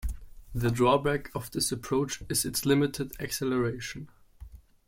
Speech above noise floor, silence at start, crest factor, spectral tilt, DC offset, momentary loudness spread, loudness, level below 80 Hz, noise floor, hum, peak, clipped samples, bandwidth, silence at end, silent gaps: 21 dB; 0 s; 20 dB; -4.5 dB/octave; under 0.1%; 15 LU; -29 LUFS; -46 dBFS; -49 dBFS; none; -10 dBFS; under 0.1%; 16.5 kHz; 0.3 s; none